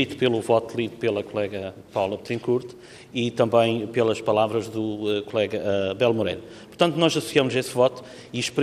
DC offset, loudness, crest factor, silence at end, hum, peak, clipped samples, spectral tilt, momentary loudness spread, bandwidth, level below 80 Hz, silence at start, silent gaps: under 0.1%; -24 LUFS; 20 dB; 0 s; none; -4 dBFS; under 0.1%; -5 dB/octave; 10 LU; 14.5 kHz; -64 dBFS; 0 s; none